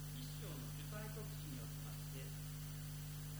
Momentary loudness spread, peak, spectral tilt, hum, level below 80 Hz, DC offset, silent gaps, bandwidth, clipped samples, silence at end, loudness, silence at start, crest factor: 1 LU; -36 dBFS; -5 dB/octave; 50 Hz at -50 dBFS; -58 dBFS; under 0.1%; none; over 20 kHz; under 0.1%; 0 s; -48 LUFS; 0 s; 12 dB